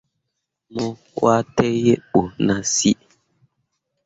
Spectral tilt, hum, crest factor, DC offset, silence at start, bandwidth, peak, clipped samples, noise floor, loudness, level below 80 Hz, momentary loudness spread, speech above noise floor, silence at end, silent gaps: -4.5 dB/octave; none; 18 dB; under 0.1%; 0.7 s; 8 kHz; -2 dBFS; under 0.1%; -78 dBFS; -20 LUFS; -52 dBFS; 10 LU; 59 dB; 1.15 s; none